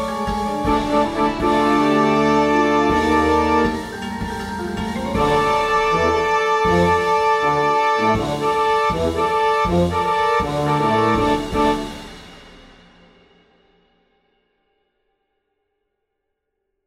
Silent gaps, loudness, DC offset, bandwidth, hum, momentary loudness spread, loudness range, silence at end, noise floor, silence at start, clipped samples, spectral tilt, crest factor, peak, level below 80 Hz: none; -18 LUFS; under 0.1%; 15.5 kHz; none; 9 LU; 5 LU; 4.4 s; -76 dBFS; 0 s; under 0.1%; -5.5 dB/octave; 14 dB; -4 dBFS; -38 dBFS